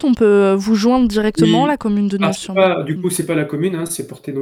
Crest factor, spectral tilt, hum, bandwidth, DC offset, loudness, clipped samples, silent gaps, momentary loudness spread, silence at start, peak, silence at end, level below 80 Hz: 14 dB; -5.5 dB/octave; none; 16.5 kHz; under 0.1%; -16 LUFS; under 0.1%; none; 7 LU; 0 s; -2 dBFS; 0 s; -44 dBFS